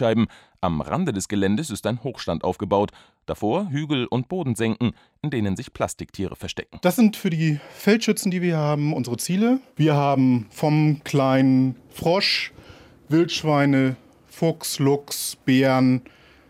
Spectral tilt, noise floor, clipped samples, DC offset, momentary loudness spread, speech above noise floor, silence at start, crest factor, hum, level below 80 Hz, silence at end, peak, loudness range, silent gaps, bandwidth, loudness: -5.5 dB/octave; -47 dBFS; under 0.1%; under 0.1%; 9 LU; 25 dB; 0 s; 16 dB; none; -56 dBFS; 0.5 s; -6 dBFS; 5 LU; none; 16 kHz; -22 LUFS